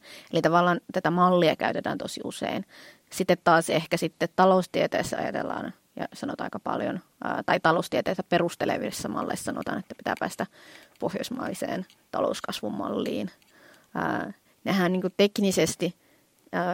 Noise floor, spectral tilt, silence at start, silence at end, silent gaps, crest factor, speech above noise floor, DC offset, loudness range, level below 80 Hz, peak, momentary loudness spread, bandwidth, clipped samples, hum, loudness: -61 dBFS; -5 dB/octave; 0.05 s; 0 s; none; 20 dB; 35 dB; under 0.1%; 7 LU; -64 dBFS; -6 dBFS; 13 LU; 16.5 kHz; under 0.1%; none; -27 LUFS